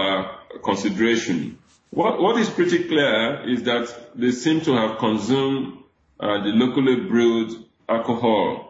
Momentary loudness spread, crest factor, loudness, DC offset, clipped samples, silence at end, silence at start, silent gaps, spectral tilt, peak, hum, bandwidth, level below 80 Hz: 10 LU; 14 dB; -21 LUFS; under 0.1%; under 0.1%; 0 s; 0 s; none; -5 dB/octave; -6 dBFS; none; 8 kHz; -60 dBFS